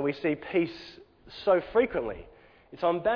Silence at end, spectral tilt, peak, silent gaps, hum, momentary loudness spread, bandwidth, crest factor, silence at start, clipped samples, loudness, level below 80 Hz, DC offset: 0 s; -7.5 dB/octave; -12 dBFS; none; none; 20 LU; 5.4 kHz; 16 dB; 0 s; under 0.1%; -28 LUFS; -56 dBFS; under 0.1%